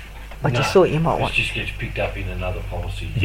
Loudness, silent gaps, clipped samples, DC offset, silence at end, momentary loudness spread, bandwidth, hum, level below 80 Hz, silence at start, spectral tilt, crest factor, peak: -21 LUFS; none; under 0.1%; under 0.1%; 0 s; 12 LU; 16.5 kHz; none; -32 dBFS; 0 s; -6 dB/octave; 18 dB; -2 dBFS